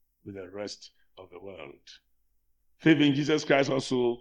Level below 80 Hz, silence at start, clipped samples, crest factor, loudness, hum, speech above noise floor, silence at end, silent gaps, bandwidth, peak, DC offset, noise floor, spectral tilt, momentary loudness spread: -68 dBFS; 0.25 s; under 0.1%; 22 dB; -25 LUFS; none; 42 dB; 0.05 s; none; 10 kHz; -6 dBFS; under 0.1%; -70 dBFS; -5.5 dB/octave; 23 LU